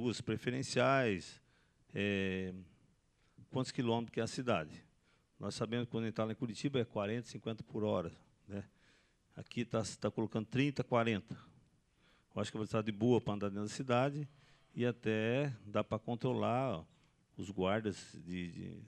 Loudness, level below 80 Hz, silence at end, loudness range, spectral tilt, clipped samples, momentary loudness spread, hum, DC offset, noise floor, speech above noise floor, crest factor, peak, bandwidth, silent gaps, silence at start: -38 LUFS; -72 dBFS; 0 s; 4 LU; -6 dB/octave; under 0.1%; 14 LU; none; under 0.1%; -73 dBFS; 36 dB; 20 dB; -18 dBFS; 11.5 kHz; none; 0 s